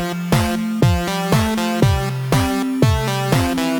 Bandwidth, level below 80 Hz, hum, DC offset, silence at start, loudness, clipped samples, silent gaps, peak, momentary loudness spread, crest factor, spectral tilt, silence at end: over 20 kHz; -32 dBFS; none; under 0.1%; 0 s; -18 LUFS; under 0.1%; none; 0 dBFS; 3 LU; 16 dB; -5.5 dB/octave; 0 s